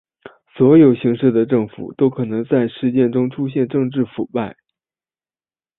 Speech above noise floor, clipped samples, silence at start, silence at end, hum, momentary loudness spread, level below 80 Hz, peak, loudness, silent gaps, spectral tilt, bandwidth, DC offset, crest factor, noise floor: over 74 dB; under 0.1%; 0.55 s; 1.25 s; none; 12 LU; -58 dBFS; -2 dBFS; -17 LUFS; none; -13 dB/octave; 4 kHz; under 0.1%; 16 dB; under -90 dBFS